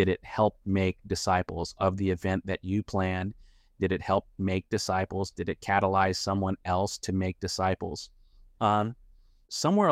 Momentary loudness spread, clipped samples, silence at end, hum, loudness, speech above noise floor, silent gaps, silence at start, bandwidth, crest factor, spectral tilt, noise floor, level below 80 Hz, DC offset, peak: 8 LU; under 0.1%; 0 s; none; -29 LUFS; 29 dB; none; 0 s; 14.5 kHz; 18 dB; -5.5 dB/octave; -57 dBFS; -54 dBFS; under 0.1%; -10 dBFS